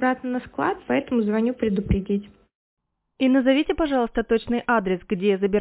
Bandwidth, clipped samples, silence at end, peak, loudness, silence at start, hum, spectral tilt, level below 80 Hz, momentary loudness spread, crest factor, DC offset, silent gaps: 4 kHz; under 0.1%; 0 s; -6 dBFS; -23 LUFS; 0 s; none; -10.5 dB/octave; -42 dBFS; 6 LU; 16 dB; under 0.1%; 2.55-2.77 s